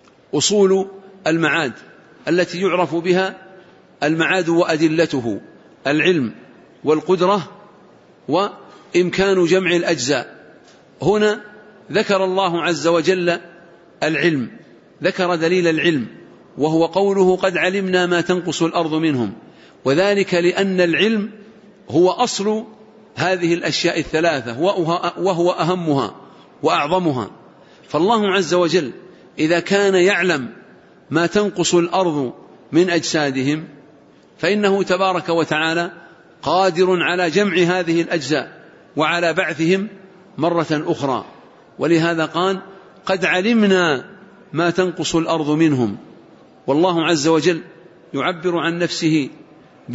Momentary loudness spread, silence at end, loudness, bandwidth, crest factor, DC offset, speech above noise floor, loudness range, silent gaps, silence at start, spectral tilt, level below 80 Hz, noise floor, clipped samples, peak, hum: 10 LU; 0 s; -18 LUFS; 8 kHz; 16 dB; under 0.1%; 31 dB; 2 LU; none; 0.35 s; -5 dB/octave; -58 dBFS; -48 dBFS; under 0.1%; -4 dBFS; none